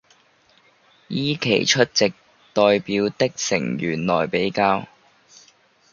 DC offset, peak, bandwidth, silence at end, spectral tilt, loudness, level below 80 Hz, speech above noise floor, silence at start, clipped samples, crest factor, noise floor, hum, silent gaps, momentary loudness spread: under 0.1%; -2 dBFS; 7.4 kHz; 1.05 s; -4 dB/octave; -21 LUFS; -58 dBFS; 38 dB; 1.1 s; under 0.1%; 20 dB; -58 dBFS; none; none; 7 LU